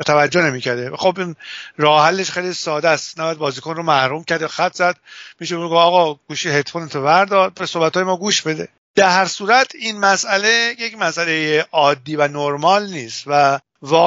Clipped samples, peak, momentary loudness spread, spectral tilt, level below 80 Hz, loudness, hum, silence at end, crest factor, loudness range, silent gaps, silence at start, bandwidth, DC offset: under 0.1%; 0 dBFS; 10 LU; -2 dB/octave; -66 dBFS; -17 LUFS; none; 0 s; 16 dB; 3 LU; 8.78-8.94 s; 0 s; 8 kHz; under 0.1%